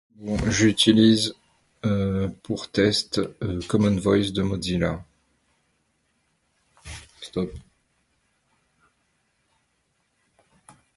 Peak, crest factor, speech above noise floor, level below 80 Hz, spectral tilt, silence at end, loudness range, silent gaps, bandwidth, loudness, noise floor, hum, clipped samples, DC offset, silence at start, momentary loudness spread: -4 dBFS; 22 dB; 49 dB; -46 dBFS; -5 dB/octave; 3.35 s; 17 LU; none; 11.5 kHz; -23 LUFS; -71 dBFS; none; under 0.1%; under 0.1%; 0.2 s; 16 LU